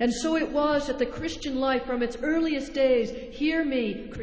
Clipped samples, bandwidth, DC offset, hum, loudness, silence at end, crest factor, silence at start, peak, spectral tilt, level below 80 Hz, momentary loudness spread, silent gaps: under 0.1%; 8 kHz; under 0.1%; none; -26 LUFS; 0 s; 14 dB; 0 s; -12 dBFS; -4.5 dB/octave; -48 dBFS; 6 LU; none